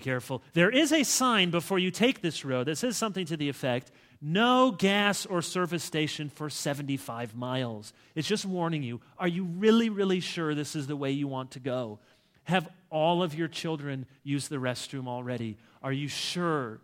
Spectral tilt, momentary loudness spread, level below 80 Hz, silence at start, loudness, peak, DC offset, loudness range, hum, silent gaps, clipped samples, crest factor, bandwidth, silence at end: -4.5 dB/octave; 12 LU; -72 dBFS; 0 s; -29 LUFS; -8 dBFS; under 0.1%; 6 LU; none; none; under 0.1%; 20 dB; 16.5 kHz; 0.05 s